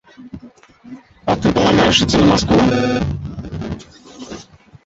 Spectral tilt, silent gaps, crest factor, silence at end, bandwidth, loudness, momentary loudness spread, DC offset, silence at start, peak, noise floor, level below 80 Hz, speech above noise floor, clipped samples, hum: -5 dB/octave; none; 16 dB; 0.45 s; 8.2 kHz; -15 LUFS; 24 LU; under 0.1%; 0.2 s; -2 dBFS; -43 dBFS; -34 dBFS; 29 dB; under 0.1%; none